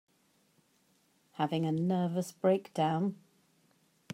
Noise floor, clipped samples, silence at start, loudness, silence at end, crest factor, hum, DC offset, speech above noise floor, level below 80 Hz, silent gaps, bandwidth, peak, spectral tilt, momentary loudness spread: -71 dBFS; under 0.1%; 1.4 s; -32 LUFS; 1 s; 18 dB; none; under 0.1%; 40 dB; -80 dBFS; none; 16 kHz; -16 dBFS; -7 dB/octave; 7 LU